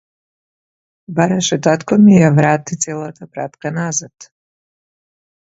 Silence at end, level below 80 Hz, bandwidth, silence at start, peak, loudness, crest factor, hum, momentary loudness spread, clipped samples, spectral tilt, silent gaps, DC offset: 1.35 s; -54 dBFS; 8 kHz; 1.1 s; 0 dBFS; -14 LUFS; 16 dB; none; 17 LU; under 0.1%; -5.5 dB/octave; none; under 0.1%